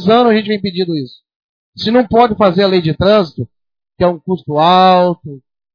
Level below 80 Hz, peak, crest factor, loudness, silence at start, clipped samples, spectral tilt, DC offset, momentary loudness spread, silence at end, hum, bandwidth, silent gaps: -42 dBFS; 0 dBFS; 12 dB; -12 LUFS; 0 s; 0.1%; -8 dB/octave; under 0.1%; 14 LU; 0.35 s; none; 5.4 kHz; 1.36-1.73 s